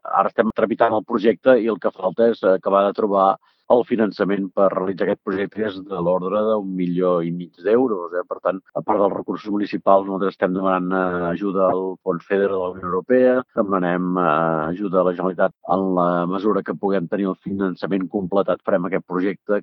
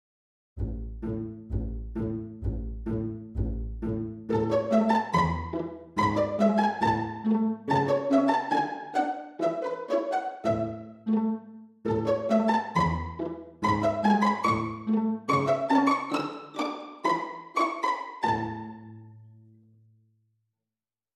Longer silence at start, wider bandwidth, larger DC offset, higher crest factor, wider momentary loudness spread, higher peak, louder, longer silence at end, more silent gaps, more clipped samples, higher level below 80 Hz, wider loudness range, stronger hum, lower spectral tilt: second, 0.05 s vs 0.55 s; second, 5.8 kHz vs 11 kHz; neither; about the same, 20 dB vs 18 dB; second, 7 LU vs 11 LU; first, 0 dBFS vs -10 dBFS; first, -20 LUFS vs -28 LUFS; second, 0 s vs 1.85 s; neither; neither; second, -62 dBFS vs -44 dBFS; second, 3 LU vs 8 LU; neither; first, -10 dB/octave vs -7 dB/octave